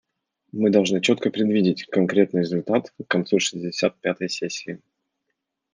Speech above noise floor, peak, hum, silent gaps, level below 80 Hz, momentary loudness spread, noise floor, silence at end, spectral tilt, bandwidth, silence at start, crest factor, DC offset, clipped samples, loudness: 57 dB; -4 dBFS; none; none; -70 dBFS; 9 LU; -79 dBFS; 0.95 s; -5 dB/octave; 10 kHz; 0.55 s; 18 dB; under 0.1%; under 0.1%; -22 LUFS